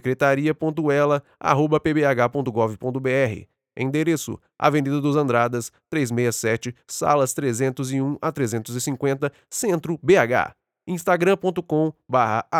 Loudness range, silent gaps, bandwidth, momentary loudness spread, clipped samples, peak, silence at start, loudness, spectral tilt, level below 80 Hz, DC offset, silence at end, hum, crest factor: 2 LU; none; 18.5 kHz; 8 LU; under 0.1%; -2 dBFS; 0.05 s; -22 LUFS; -5.5 dB/octave; -60 dBFS; under 0.1%; 0 s; none; 20 dB